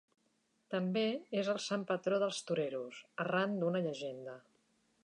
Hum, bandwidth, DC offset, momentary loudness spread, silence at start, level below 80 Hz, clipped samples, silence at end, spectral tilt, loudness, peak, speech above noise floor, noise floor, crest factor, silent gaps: none; 11 kHz; under 0.1%; 10 LU; 0.7 s; -88 dBFS; under 0.1%; 0.65 s; -5 dB/octave; -37 LUFS; -20 dBFS; 41 dB; -77 dBFS; 16 dB; none